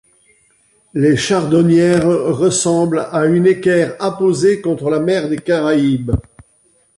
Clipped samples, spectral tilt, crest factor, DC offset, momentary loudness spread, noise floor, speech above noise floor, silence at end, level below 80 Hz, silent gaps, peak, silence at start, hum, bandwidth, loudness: under 0.1%; -5.5 dB/octave; 12 dB; under 0.1%; 6 LU; -56 dBFS; 42 dB; 0.75 s; -38 dBFS; none; -2 dBFS; 0.95 s; none; 11.5 kHz; -14 LUFS